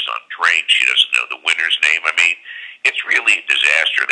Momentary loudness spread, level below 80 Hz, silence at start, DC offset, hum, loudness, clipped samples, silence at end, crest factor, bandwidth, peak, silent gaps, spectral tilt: 6 LU; -78 dBFS; 0 s; under 0.1%; none; -14 LUFS; under 0.1%; 0 s; 16 dB; 11 kHz; 0 dBFS; none; 3.5 dB/octave